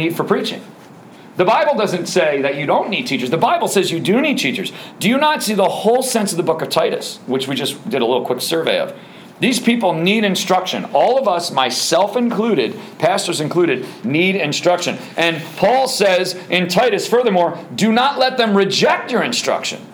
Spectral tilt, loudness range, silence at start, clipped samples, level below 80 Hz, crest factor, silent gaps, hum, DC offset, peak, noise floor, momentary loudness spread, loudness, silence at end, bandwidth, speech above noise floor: -4 dB/octave; 2 LU; 0 s; under 0.1%; -66 dBFS; 16 dB; none; none; under 0.1%; 0 dBFS; -40 dBFS; 6 LU; -16 LUFS; 0 s; over 20 kHz; 23 dB